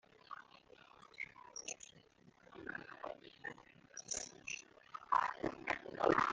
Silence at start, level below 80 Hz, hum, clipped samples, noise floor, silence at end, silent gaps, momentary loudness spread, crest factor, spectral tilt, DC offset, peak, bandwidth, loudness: 0.3 s; -72 dBFS; none; under 0.1%; -67 dBFS; 0 s; none; 23 LU; 26 dB; -3 dB/octave; under 0.1%; -18 dBFS; 10 kHz; -42 LUFS